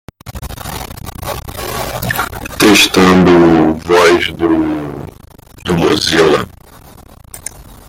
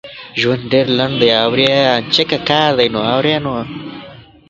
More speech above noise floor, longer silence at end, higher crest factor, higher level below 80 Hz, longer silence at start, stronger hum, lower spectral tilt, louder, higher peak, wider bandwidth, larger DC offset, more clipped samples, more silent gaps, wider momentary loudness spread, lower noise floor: first, 28 dB vs 23 dB; second, 0.15 s vs 0.3 s; about the same, 14 dB vs 16 dB; first, -36 dBFS vs -48 dBFS; first, 0.25 s vs 0.05 s; neither; about the same, -4.5 dB/octave vs -5.5 dB/octave; first, -11 LUFS vs -14 LUFS; about the same, 0 dBFS vs 0 dBFS; first, 17 kHz vs 7.8 kHz; neither; neither; neither; first, 21 LU vs 12 LU; about the same, -38 dBFS vs -37 dBFS